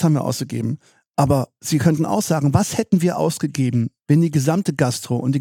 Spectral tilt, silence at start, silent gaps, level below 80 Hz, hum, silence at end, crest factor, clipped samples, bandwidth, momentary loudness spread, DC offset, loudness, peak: -6.5 dB/octave; 0 s; 1.07-1.14 s; -50 dBFS; none; 0 s; 18 dB; under 0.1%; 17 kHz; 6 LU; under 0.1%; -20 LUFS; -2 dBFS